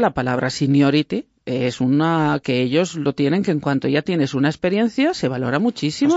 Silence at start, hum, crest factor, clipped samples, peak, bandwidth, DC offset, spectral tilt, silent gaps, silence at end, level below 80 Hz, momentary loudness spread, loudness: 0 s; none; 14 dB; under 0.1%; -6 dBFS; 8 kHz; under 0.1%; -6.5 dB/octave; none; 0 s; -54 dBFS; 5 LU; -19 LUFS